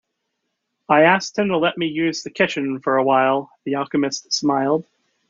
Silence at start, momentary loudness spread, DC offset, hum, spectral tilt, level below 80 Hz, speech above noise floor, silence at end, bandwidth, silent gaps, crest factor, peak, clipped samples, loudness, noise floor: 0.9 s; 8 LU; under 0.1%; none; -4.5 dB/octave; -66 dBFS; 57 dB; 0.5 s; 7.6 kHz; none; 18 dB; -2 dBFS; under 0.1%; -19 LUFS; -76 dBFS